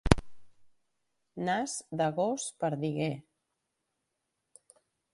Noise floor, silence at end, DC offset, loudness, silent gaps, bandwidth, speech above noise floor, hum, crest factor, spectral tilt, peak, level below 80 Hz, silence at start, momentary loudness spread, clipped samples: -84 dBFS; 1.95 s; under 0.1%; -32 LUFS; none; 11.5 kHz; 52 dB; none; 32 dB; -5 dB/octave; -2 dBFS; -44 dBFS; 0.05 s; 8 LU; under 0.1%